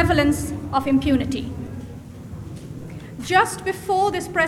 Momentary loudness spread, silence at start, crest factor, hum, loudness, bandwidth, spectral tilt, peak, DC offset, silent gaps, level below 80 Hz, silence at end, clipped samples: 17 LU; 0 s; 20 dB; none; -21 LUFS; 16 kHz; -5 dB/octave; -2 dBFS; under 0.1%; none; -38 dBFS; 0 s; under 0.1%